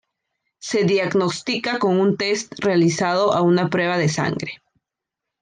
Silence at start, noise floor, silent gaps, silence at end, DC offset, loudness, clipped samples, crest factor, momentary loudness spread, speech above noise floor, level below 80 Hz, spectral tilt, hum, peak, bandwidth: 0.6 s; -84 dBFS; none; 0.85 s; under 0.1%; -20 LUFS; under 0.1%; 14 dB; 7 LU; 65 dB; -62 dBFS; -5 dB/octave; none; -6 dBFS; 9.8 kHz